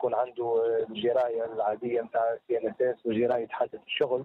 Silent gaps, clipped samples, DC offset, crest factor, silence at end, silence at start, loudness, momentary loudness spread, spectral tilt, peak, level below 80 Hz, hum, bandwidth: none; under 0.1%; under 0.1%; 14 dB; 0 s; 0 s; -29 LUFS; 4 LU; -7.5 dB/octave; -14 dBFS; -72 dBFS; none; 4.3 kHz